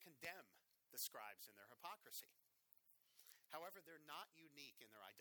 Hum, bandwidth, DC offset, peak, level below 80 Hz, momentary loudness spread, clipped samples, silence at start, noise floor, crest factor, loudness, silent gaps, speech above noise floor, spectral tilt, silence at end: none; over 20 kHz; under 0.1%; -36 dBFS; under -90 dBFS; 13 LU; under 0.1%; 0 s; -78 dBFS; 24 dB; -56 LUFS; none; 20 dB; -0.5 dB/octave; 0 s